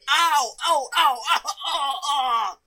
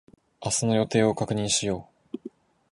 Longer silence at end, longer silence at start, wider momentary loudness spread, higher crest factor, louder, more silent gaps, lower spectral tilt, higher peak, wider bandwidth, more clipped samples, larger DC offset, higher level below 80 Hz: second, 0.1 s vs 0.45 s; second, 0.05 s vs 0.4 s; second, 6 LU vs 17 LU; about the same, 16 dB vs 18 dB; first, -21 LUFS vs -25 LUFS; neither; second, 2.5 dB/octave vs -4 dB/octave; first, -6 dBFS vs -10 dBFS; first, 16.5 kHz vs 11.5 kHz; neither; neither; second, -66 dBFS vs -56 dBFS